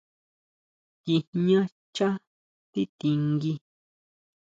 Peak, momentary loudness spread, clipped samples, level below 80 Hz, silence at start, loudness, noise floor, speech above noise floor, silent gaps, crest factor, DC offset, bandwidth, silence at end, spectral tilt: -12 dBFS; 12 LU; under 0.1%; -70 dBFS; 1.05 s; -27 LUFS; under -90 dBFS; over 65 dB; 1.27-1.33 s, 1.72-1.93 s, 2.27-2.73 s, 2.89-2.99 s; 18 dB; under 0.1%; 7.8 kHz; 0.85 s; -7.5 dB/octave